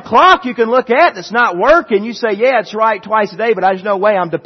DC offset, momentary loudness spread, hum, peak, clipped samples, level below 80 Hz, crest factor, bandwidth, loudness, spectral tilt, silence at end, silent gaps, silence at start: under 0.1%; 6 LU; none; 0 dBFS; under 0.1%; -46 dBFS; 12 dB; 6.4 kHz; -12 LUFS; -5 dB/octave; 0.05 s; none; 0.05 s